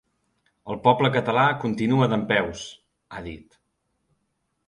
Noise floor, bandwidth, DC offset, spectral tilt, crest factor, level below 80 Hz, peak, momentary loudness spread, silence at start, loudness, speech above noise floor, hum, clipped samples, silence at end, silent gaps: -75 dBFS; 11 kHz; under 0.1%; -6.5 dB/octave; 22 dB; -56 dBFS; -2 dBFS; 19 LU; 0.65 s; -22 LUFS; 52 dB; none; under 0.1%; 1.3 s; none